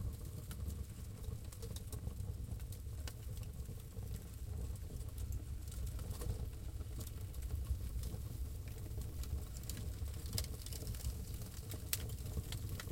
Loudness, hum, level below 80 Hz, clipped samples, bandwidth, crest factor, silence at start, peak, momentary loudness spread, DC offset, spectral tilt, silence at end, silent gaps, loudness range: -46 LUFS; none; -46 dBFS; under 0.1%; 17 kHz; 32 dB; 0 s; -12 dBFS; 6 LU; under 0.1%; -4.5 dB/octave; 0 s; none; 3 LU